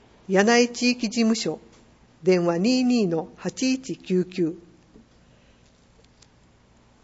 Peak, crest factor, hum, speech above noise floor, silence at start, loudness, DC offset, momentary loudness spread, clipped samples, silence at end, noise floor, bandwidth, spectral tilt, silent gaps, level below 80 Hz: -6 dBFS; 20 dB; 60 Hz at -50 dBFS; 35 dB; 0.3 s; -23 LUFS; under 0.1%; 10 LU; under 0.1%; 2.45 s; -57 dBFS; 8 kHz; -4.5 dB/octave; none; -62 dBFS